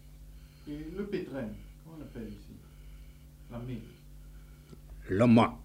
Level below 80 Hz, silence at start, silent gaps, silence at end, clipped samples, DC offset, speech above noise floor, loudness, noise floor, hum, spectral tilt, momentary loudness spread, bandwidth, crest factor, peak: -52 dBFS; 0.05 s; none; 0 s; under 0.1%; under 0.1%; 21 dB; -32 LUFS; -51 dBFS; none; -8 dB/octave; 27 LU; 15.5 kHz; 24 dB; -10 dBFS